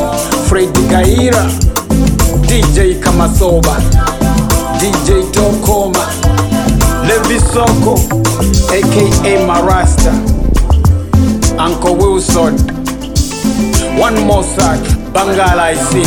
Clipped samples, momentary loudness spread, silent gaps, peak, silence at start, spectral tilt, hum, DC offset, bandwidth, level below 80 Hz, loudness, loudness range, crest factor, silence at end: under 0.1%; 4 LU; none; 0 dBFS; 0 s; -5 dB/octave; none; under 0.1%; 18.5 kHz; -16 dBFS; -11 LUFS; 2 LU; 10 dB; 0 s